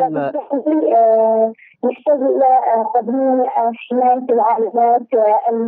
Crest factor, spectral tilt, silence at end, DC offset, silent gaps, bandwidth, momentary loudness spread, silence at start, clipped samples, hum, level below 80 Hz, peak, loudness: 10 dB; -10 dB/octave; 0 s; under 0.1%; none; 3.7 kHz; 8 LU; 0 s; under 0.1%; none; -80 dBFS; -4 dBFS; -15 LUFS